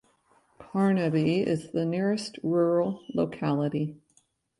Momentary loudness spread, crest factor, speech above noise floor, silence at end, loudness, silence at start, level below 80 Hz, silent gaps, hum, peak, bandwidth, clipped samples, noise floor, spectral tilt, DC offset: 6 LU; 14 dB; 41 dB; 0.65 s; -27 LUFS; 0.6 s; -64 dBFS; none; none; -14 dBFS; 11.5 kHz; under 0.1%; -68 dBFS; -7.5 dB/octave; under 0.1%